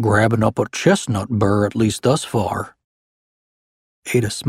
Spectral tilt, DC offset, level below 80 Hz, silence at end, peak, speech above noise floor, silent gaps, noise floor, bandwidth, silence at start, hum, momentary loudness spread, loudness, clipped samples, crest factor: -5.5 dB/octave; under 0.1%; -48 dBFS; 0 s; 0 dBFS; over 72 dB; 2.84-4.02 s; under -90 dBFS; 15 kHz; 0 s; none; 8 LU; -19 LUFS; under 0.1%; 18 dB